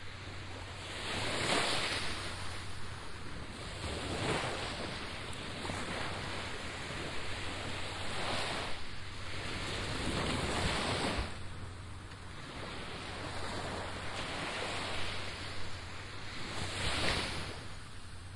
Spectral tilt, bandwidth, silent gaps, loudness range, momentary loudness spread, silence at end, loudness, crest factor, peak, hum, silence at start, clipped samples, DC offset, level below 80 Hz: -3.5 dB/octave; 11.5 kHz; none; 3 LU; 12 LU; 0 s; -38 LUFS; 20 dB; -18 dBFS; none; 0 s; under 0.1%; under 0.1%; -50 dBFS